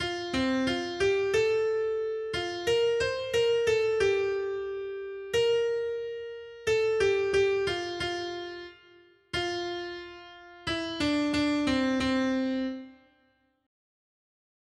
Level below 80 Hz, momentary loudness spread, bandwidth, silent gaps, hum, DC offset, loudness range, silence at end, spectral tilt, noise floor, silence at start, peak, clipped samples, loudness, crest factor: -56 dBFS; 13 LU; 12.5 kHz; none; none; under 0.1%; 5 LU; 1.7 s; -4.5 dB/octave; -69 dBFS; 0 s; -14 dBFS; under 0.1%; -28 LUFS; 14 dB